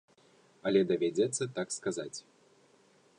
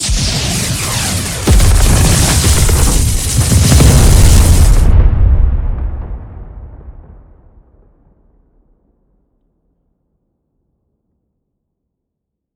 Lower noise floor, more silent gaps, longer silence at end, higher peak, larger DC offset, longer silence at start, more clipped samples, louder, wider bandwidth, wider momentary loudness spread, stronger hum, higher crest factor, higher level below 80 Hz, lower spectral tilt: second, -65 dBFS vs -76 dBFS; neither; second, 1 s vs 5.65 s; second, -14 dBFS vs 0 dBFS; neither; first, 0.65 s vs 0 s; second, under 0.1% vs 0.7%; second, -32 LUFS vs -11 LUFS; second, 11 kHz vs over 20 kHz; second, 12 LU vs 17 LU; neither; first, 20 dB vs 12 dB; second, -76 dBFS vs -14 dBFS; about the same, -4.5 dB/octave vs -4 dB/octave